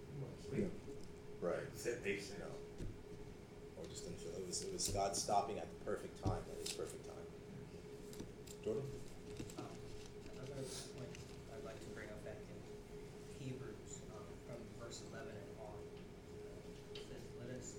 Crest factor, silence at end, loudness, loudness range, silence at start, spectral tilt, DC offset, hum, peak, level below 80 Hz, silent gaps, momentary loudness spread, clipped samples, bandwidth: 22 dB; 0 s; -48 LUFS; 9 LU; 0 s; -4 dB/octave; under 0.1%; none; -24 dBFS; -60 dBFS; none; 12 LU; under 0.1%; 18 kHz